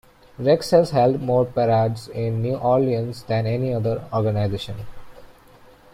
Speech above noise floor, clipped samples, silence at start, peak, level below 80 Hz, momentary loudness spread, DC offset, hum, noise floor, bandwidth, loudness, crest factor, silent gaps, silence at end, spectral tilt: 29 dB; under 0.1%; 0.4 s; -4 dBFS; -50 dBFS; 9 LU; under 0.1%; none; -49 dBFS; 15 kHz; -21 LUFS; 18 dB; none; 0.6 s; -7.5 dB/octave